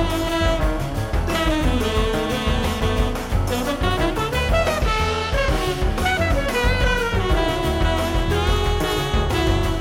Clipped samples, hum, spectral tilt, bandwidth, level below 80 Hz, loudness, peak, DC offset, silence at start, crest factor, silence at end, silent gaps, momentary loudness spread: under 0.1%; none; -5 dB/octave; 17 kHz; -24 dBFS; -21 LUFS; -8 dBFS; under 0.1%; 0 s; 12 dB; 0 s; none; 3 LU